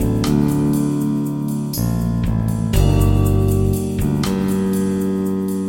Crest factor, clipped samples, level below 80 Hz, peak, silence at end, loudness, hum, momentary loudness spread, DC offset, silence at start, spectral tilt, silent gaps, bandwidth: 14 dB; under 0.1%; -26 dBFS; -4 dBFS; 0 s; -18 LUFS; none; 5 LU; under 0.1%; 0 s; -7 dB/octave; none; 17 kHz